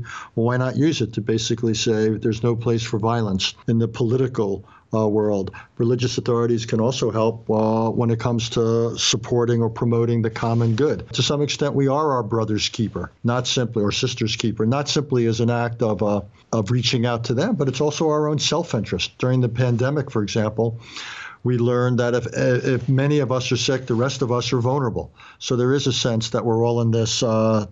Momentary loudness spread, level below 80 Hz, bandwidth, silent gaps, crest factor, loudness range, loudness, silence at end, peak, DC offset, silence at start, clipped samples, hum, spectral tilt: 5 LU; -54 dBFS; 8 kHz; none; 16 dB; 2 LU; -21 LUFS; 0 s; -4 dBFS; under 0.1%; 0 s; under 0.1%; none; -5.5 dB/octave